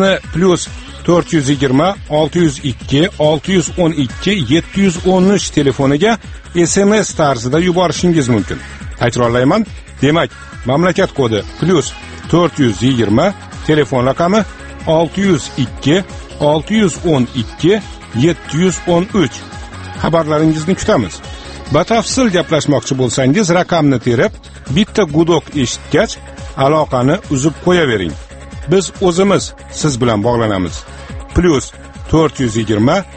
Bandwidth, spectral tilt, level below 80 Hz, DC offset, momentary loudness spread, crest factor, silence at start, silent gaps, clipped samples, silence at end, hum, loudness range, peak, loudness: 8.8 kHz; -5.5 dB/octave; -34 dBFS; under 0.1%; 11 LU; 14 dB; 0 s; none; under 0.1%; 0 s; none; 2 LU; 0 dBFS; -14 LUFS